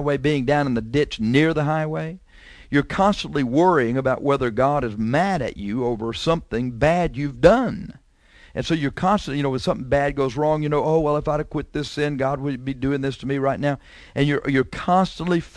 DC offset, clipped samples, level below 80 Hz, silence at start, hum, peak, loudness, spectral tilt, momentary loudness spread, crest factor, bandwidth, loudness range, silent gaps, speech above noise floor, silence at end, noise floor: under 0.1%; under 0.1%; -42 dBFS; 0 s; none; 0 dBFS; -21 LUFS; -7 dB/octave; 8 LU; 22 dB; 11 kHz; 3 LU; none; 30 dB; 0.1 s; -51 dBFS